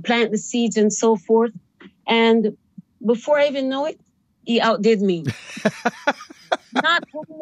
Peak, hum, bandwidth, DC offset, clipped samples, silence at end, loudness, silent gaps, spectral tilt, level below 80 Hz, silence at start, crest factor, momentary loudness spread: -4 dBFS; none; 11 kHz; under 0.1%; under 0.1%; 0 s; -20 LUFS; none; -4 dB/octave; -74 dBFS; 0 s; 18 dB; 10 LU